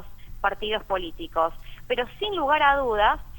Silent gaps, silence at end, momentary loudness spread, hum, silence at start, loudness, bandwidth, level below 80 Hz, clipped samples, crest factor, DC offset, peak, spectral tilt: none; 0 s; 10 LU; none; 0 s; -25 LUFS; 19 kHz; -42 dBFS; under 0.1%; 20 dB; under 0.1%; -6 dBFS; -5 dB/octave